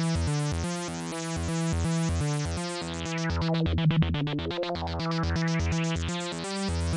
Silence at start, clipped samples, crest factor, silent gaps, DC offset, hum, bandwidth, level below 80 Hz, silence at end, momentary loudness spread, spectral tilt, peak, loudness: 0 s; under 0.1%; 12 dB; none; under 0.1%; none; 11.5 kHz; -42 dBFS; 0 s; 6 LU; -5.5 dB/octave; -16 dBFS; -29 LUFS